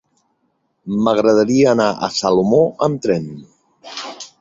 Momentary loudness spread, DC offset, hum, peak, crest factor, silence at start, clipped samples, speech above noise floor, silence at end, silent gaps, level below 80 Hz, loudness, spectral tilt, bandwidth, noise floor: 18 LU; under 0.1%; none; -2 dBFS; 16 dB; 0.85 s; under 0.1%; 51 dB; 0.15 s; none; -56 dBFS; -16 LUFS; -5.5 dB/octave; 7.8 kHz; -67 dBFS